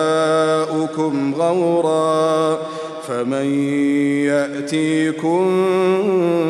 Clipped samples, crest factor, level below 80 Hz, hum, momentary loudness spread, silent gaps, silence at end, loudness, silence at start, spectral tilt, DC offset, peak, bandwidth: under 0.1%; 12 dB; -70 dBFS; none; 5 LU; none; 0 s; -18 LUFS; 0 s; -6 dB/octave; under 0.1%; -6 dBFS; 12.5 kHz